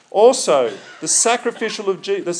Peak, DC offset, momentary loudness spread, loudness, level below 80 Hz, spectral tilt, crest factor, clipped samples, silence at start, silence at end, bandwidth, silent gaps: 0 dBFS; under 0.1%; 10 LU; -17 LUFS; -88 dBFS; -1.5 dB/octave; 18 dB; under 0.1%; 0.15 s; 0 s; 10.5 kHz; none